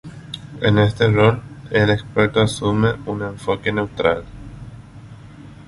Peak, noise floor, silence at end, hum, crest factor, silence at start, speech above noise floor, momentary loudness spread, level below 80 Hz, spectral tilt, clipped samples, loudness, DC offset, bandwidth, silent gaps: -2 dBFS; -39 dBFS; 0.05 s; 50 Hz at -40 dBFS; 18 dB; 0.05 s; 22 dB; 19 LU; -42 dBFS; -6.5 dB/octave; under 0.1%; -19 LUFS; under 0.1%; 11.5 kHz; none